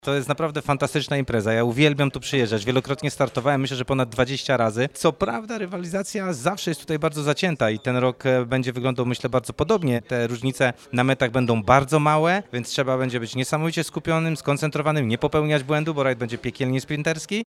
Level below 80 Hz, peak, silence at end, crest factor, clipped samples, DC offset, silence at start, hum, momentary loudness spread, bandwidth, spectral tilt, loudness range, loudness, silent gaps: -50 dBFS; 0 dBFS; 0 s; 22 dB; under 0.1%; under 0.1%; 0.05 s; none; 7 LU; 15 kHz; -5.5 dB/octave; 3 LU; -23 LUFS; none